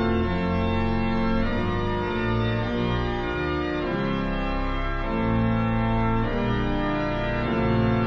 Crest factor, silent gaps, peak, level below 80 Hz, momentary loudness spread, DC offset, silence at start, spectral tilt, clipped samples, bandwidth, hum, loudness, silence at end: 14 dB; none; -10 dBFS; -32 dBFS; 4 LU; under 0.1%; 0 s; -8.5 dB/octave; under 0.1%; 6.8 kHz; none; -25 LUFS; 0 s